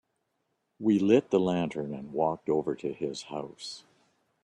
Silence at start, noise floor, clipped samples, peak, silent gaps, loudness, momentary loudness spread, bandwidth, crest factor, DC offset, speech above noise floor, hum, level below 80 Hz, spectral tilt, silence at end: 0.8 s; -78 dBFS; under 0.1%; -10 dBFS; none; -29 LUFS; 16 LU; 11 kHz; 20 dB; under 0.1%; 50 dB; none; -68 dBFS; -6.5 dB/octave; 0.65 s